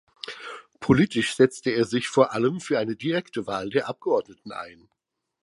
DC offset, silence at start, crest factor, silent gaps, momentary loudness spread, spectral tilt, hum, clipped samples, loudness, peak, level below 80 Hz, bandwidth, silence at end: under 0.1%; 0.25 s; 22 dB; none; 17 LU; -5.5 dB/octave; none; under 0.1%; -24 LUFS; -2 dBFS; -58 dBFS; 11.5 kHz; 0.7 s